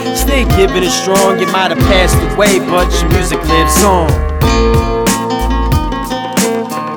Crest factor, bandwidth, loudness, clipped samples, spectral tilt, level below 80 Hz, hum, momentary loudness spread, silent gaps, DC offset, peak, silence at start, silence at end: 10 dB; over 20 kHz; -11 LUFS; under 0.1%; -4.5 dB/octave; -18 dBFS; none; 5 LU; none; under 0.1%; 0 dBFS; 0 s; 0 s